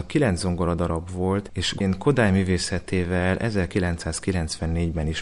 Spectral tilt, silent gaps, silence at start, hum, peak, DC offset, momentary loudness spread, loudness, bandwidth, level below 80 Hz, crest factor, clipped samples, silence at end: -5.5 dB/octave; none; 0 s; none; -8 dBFS; under 0.1%; 6 LU; -24 LUFS; 11.5 kHz; -34 dBFS; 16 dB; under 0.1%; 0 s